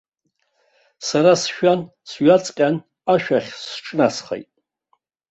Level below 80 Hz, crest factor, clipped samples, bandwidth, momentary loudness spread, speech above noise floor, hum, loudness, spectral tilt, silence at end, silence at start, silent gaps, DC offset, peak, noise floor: -64 dBFS; 18 dB; under 0.1%; 8.2 kHz; 14 LU; 53 dB; none; -19 LUFS; -5 dB/octave; 0.9 s; 1 s; none; under 0.1%; -2 dBFS; -71 dBFS